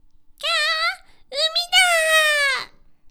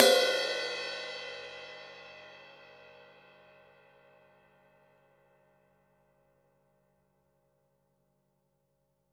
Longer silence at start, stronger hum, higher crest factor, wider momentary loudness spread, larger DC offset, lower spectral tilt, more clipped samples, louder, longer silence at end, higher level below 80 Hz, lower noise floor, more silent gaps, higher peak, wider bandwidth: first, 0.4 s vs 0 s; neither; second, 14 dB vs 34 dB; second, 14 LU vs 27 LU; neither; second, 3.5 dB/octave vs -0.5 dB/octave; neither; first, -18 LUFS vs -31 LUFS; second, 0.45 s vs 6.65 s; first, -54 dBFS vs -84 dBFS; second, -40 dBFS vs -77 dBFS; neither; second, -6 dBFS vs -2 dBFS; first, over 20 kHz vs 18 kHz